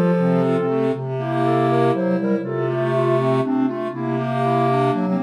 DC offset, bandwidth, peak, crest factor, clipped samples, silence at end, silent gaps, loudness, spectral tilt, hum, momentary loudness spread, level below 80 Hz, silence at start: under 0.1%; 11 kHz; -6 dBFS; 12 dB; under 0.1%; 0 s; none; -20 LUFS; -9 dB/octave; none; 5 LU; -70 dBFS; 0 s